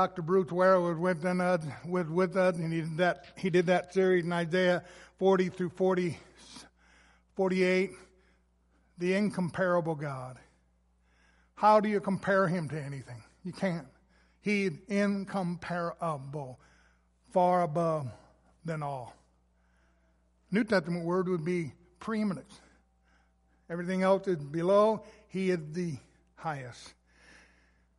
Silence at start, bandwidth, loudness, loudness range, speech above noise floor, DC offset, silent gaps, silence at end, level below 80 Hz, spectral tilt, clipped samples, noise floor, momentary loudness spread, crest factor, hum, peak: 0 s; 11.5 kHz; -30 LUFS; 5 LU; 39 dB; under 0.1%; none; 1.1 s; -66 dBFS; -7 dB/octave; under 0.1%; -69 dBFS; 16 LU; 20 dB; none; -12 dBFS